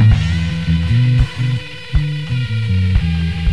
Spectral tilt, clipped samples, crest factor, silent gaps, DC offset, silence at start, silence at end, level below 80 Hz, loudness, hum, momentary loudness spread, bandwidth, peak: -7 dB/octave; under 0.1%; 14 dB; none; 2%; 0 s; 0 s; -22 dBFS; -17 LUFS; none; 6 LU; 11 kHz; 0 dBFS